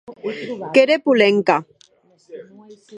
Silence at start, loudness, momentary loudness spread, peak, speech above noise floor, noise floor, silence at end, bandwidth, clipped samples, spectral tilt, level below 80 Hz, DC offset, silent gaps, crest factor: 0.1 s; -17 LUFS; 14 LU; 0 dBFS; 37 dB; -55 dBFS; 0 s; 10.5 kHz; under 0.1%; -5.5 dB/octave; -72 dBFS; under 0.1%; none; 18 dB